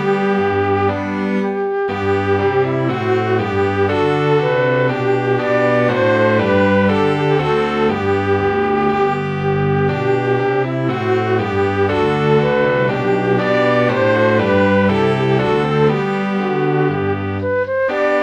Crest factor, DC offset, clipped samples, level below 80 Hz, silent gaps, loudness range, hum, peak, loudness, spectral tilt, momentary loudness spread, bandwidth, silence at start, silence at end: 12 dB; under 0.1%; under 0.1%; -48 dBFS; none; 2 LU; none; -2 dBFS; -16 LUFS; -7.5 dB/octave; 5 LU; 8.4 kHz; 0 s; 0 s